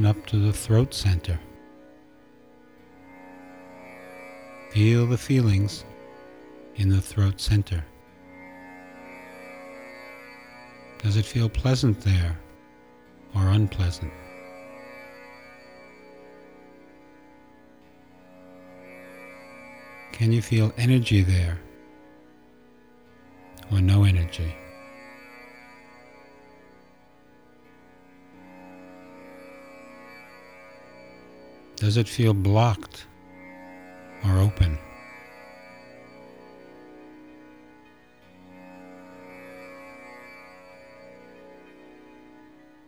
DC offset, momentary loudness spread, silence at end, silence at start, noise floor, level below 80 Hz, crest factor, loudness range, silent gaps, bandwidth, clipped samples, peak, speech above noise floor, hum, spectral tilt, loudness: 0.1%; 26 LU; 2.5 s; 0 s; -56 dBFS; -44 dBFS; 20 dB; 22 LU; none; 13.5 kHz; under 0.1%; -6 dBFS; 34 dB; none; -6.5 dB/octave; -24 LUFS